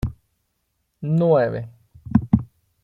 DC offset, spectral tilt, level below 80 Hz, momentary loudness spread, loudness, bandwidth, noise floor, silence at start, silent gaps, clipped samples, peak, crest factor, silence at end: under 0.1%; -10.5 dB/octave; -42 dBFS; 17 LU; -21 LUFS; 4.7 kHz; -72 dBFS; 0.05 s; none; under 0.1%; -2 dBFS; 20 dB; 0.4 s